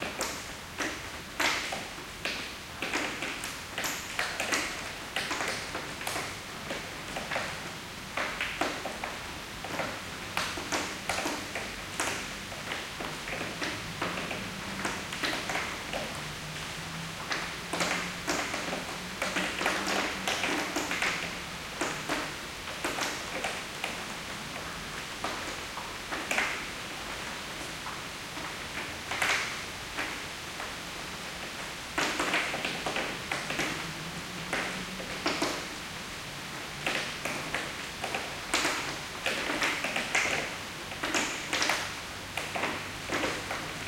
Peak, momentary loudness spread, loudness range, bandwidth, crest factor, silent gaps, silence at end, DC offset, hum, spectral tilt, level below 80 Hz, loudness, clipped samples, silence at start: -10 dBFS; 8 LU; 4 LU; 16.5 kHz; 24 dB; none; 0 s; under 0.1%; none; -2 dB/octave; -56 dBFS; -33 LUFS; under 0.1%; 0 s